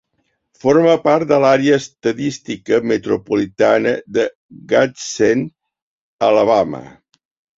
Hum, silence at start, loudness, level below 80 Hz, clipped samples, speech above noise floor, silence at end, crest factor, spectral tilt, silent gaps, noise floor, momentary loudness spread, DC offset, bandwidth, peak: none; 0.65 s; -16 LUFS; -56 dBFS; under 0.1%; 53 dB; 0.7 s; 16 dB; -5.5 dB/octave; 4.35-4.49 s, 5.82-6.19 s; -68 dBFS; 10 LU; under 0.1%; 7.8 kHz; -2 dBFS